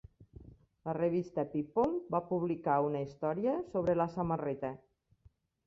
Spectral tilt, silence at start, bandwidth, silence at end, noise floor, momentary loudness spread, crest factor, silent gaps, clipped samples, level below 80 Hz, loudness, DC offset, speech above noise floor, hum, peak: -9.5 dB/octave; 0.2 s; 7.4 kHz; 0.9 s; -67 dBFS; 8 LU; 18 dB; none; under 0.1%; -64 dBFS; -34 LUFS; under 0.1%; 34 dB; none; -16 dBFS